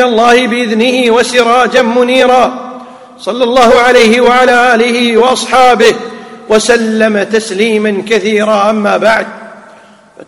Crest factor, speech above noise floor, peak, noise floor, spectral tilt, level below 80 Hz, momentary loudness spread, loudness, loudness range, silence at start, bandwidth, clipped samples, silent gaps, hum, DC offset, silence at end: 8 dB; 30 dB; 0 dBFS; -38 dBFS; -3.5 dB/octave; -44 dBFS; 8 LU; -8 LUFS; 3 LU; 0 s; 14 kHz; 3%; none; none; under 0.1%; 0.05 s